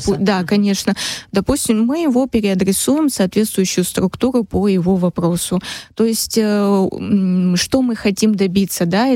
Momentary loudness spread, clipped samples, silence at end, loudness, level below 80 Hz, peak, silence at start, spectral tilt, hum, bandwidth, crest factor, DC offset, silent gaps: 4 LU; under 0.1%; 0 s; -16 LUFS; -42 dBFS; -2 dBFS; 0 s; -5 dB/octave; none; 16.5 kHz; 12 dB; under 0.1%; none